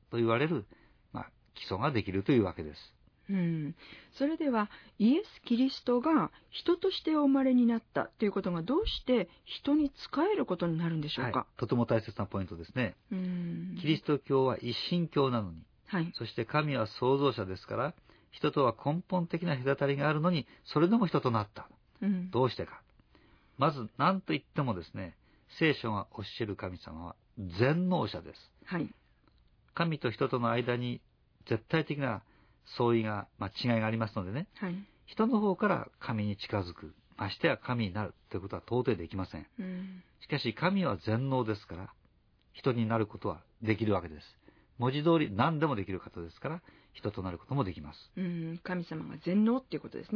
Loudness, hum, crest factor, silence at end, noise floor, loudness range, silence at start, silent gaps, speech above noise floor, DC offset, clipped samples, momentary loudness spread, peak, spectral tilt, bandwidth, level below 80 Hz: -32 LUFS; none; 22 dB; 0 s; -67 dBFS; 5 LU; 0.1 s; none; 36 dB; under 0.1%; under 0.1%; 14 LU; -12 dBFS; -8.5 dB/octave; 5.4 kHz; -60 dBFS